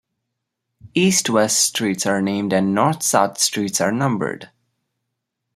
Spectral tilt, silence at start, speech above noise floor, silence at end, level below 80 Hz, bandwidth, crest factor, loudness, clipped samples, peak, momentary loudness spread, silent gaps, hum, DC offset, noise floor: -3.5 dB/octave; 0.85 s; 60 dB; 1.1 s; -62 dBFS; 16 kHz; 18 dB; -18 LUFS; under 0.1%; -2 dBFS; 6 LU; none; none; under 0.1%; -78 dBFS